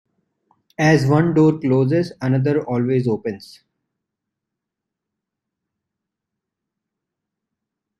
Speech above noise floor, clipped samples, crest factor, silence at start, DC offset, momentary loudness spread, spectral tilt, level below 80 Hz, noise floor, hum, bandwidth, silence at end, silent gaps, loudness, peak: 66 dB; under 0.1%; 20 dB; 0.8 s; under 0.1%; 11 LU; -8 dB/octave; -58 dBFS; -83 dBFS; none; 11.5 kHz; 4.55 s; none; -18 LUFS; -2 dBFS